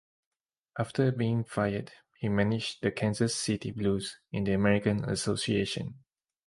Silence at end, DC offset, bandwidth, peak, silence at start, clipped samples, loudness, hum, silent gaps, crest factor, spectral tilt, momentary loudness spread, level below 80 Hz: 0.5 s; under 0.1%; 11.5 kHz; -10 dBFS; 0.75 s; under 0.1%; -30 LUFS; none; none; 20 dB; -5.5 dB/octave; 10 LU; -56 dBFS